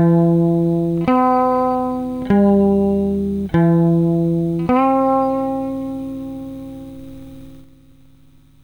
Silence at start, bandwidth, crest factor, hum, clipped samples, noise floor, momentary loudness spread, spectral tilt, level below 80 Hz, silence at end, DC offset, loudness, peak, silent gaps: 0 s; 9.2 kHz; 12 dB; 50 Hz at -35 dBFS; under 0.1%; -50 dBFS; 17 LU; -10 dB/octave; -44 dBFS; 1.05 s; 0.2%; -17 LUFS; -6 dBFS; none